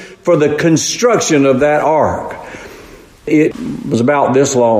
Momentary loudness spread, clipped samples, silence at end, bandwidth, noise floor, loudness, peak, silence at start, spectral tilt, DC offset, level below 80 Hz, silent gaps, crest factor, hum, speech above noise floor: 17 LU; under 0.1%; 0 s; 15.5 kHz; -37 dBFS; -12 LUFS; 0 dBFS; 0 s; -5 dB/octave; under 0.1%; -46 dBFS; none; 12 dB; none; 25 dB